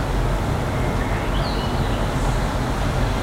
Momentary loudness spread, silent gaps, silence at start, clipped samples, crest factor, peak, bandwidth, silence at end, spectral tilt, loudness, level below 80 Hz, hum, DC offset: 1 LU; none; 0 s; under 0.1%; 12 dB; -10 dBFS; 16 kHz; 0 s; -6 dB/octave; -23 LUFS; -26 dBFS; none; under 0.1%